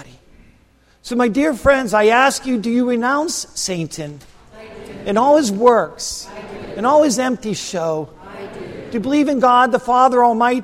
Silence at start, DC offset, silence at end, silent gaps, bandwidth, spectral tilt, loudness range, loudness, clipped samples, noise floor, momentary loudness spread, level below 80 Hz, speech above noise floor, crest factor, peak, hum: 0 s; under 0.1%; 0 s; none; 16 kHz; -4 dB/octave; 3 LU; -16 LUFS; under 0.1%; -53 dBFS; 19 LU; -46 dBFS; 38 dB; 16 dB; 0 dBFS; none